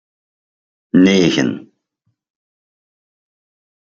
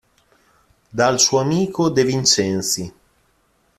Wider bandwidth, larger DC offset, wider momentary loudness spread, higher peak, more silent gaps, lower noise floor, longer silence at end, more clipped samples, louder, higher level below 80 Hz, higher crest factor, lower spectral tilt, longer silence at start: second, 7.6 kHz vs 14.5 kHz; neither; about the same, 11 LU vs 9 LU; about the same, -2 dBFS vs -2 dBFS; neither; first, -70 dBFS vs -62 dBFS; first, 2.2 s vs 0.9 s; neither; first, -14 LUFS vs -17 LUFS; about the same, -58 dBFS vs -56 dBFS; about the same, 18 dB vs 18 dB; first, -5.5 dB/octave vs -3.5 dB/octave; about the same, 0.95 s vs 0.95 s